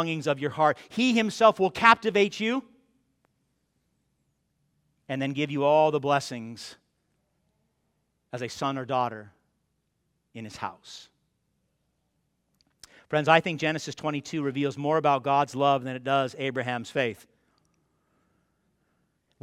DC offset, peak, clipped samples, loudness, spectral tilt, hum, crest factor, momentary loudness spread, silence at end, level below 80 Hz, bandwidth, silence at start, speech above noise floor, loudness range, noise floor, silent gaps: under 0.1%; -2 dBFS; under 0.1%; -25 LUFS; -5 dB/octave; none; 26 dB; 16 LU; 2.25 s; -72 dBFS; 15 kHz; 0 s; 50 dB; 12 LU; -76 dBFS; none